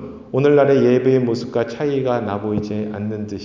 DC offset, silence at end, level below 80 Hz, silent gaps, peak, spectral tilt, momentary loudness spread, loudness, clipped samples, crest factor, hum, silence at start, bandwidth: under 0.1%; 0 s; -50 dBFS; none; -2 dBFS; -8 dB/octave; 11 LU; -18 LUFS; under 0.1%; 16 dB; none; 0 s; 7.6 kHz